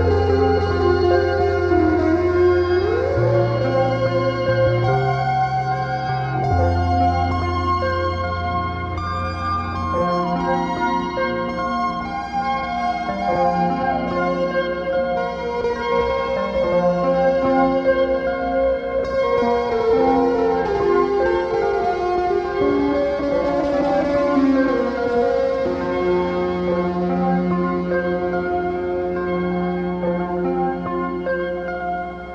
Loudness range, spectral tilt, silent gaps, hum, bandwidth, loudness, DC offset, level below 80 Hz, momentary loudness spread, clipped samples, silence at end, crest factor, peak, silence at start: 4 LU; -8 dB/octave; none; none; 7.6 kHz; -20 LUFS; under 0.1%; -38 dBFS; 6 LU; under 0.1%; 0 s; 16 dB; -4 dBFS; 0 s